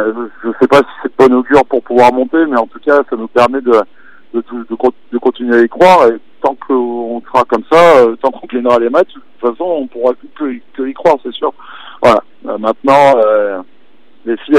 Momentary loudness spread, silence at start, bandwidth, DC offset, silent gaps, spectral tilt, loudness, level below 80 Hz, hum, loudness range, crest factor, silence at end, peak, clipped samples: 14 LU; 0 s; 13 kHz; 2%; none; -6 dB/octave; -11 LUFS; -48 dBFS; none; 5 LU; 12 dB; 0 s; 0 dBFS; under 0.1%